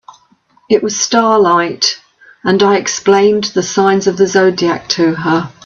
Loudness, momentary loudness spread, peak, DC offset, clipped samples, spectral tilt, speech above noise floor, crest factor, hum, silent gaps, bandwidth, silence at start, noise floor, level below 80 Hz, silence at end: -12 LUFS; 5 LU; 0 dBFS; under 0.1%; under 0.1%; -4 dB/octave; 40 dB; 12 dB; none; none; 7.6 kHz; 0.7 s; -52 dBFS; -54 dBFS; 0.15 s